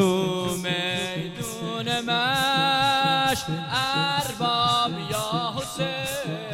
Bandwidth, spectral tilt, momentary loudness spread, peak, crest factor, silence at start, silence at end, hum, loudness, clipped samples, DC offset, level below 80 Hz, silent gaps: 17 kHz; -3.5 dB/octave; 9 LU; -6 dBFS; 18 dB; 0 s; 0 s; none; -24 LUFS; under 0.1%; under 0.1%; -54 dBFS; none